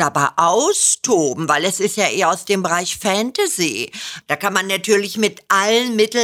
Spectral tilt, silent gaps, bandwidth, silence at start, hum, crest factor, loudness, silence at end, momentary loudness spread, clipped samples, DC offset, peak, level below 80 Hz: -2.5 dB/octave; none; 16.5 kHz; 0 s; none; 16 dB; -17 LUFS; 0 s; 6 LU; under 0.1%; under 0.1%; 0 dBFS; -62 dBFS